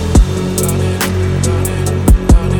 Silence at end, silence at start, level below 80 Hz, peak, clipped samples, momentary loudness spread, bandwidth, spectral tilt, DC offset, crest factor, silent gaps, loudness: 0 s; 0 s; -14 dBFS; 0 dBFS; under 0.1%; 4 LU; 19.5 kHz; -6 dB/octave; under 0.1%; 12 dB; none; -14 LUFS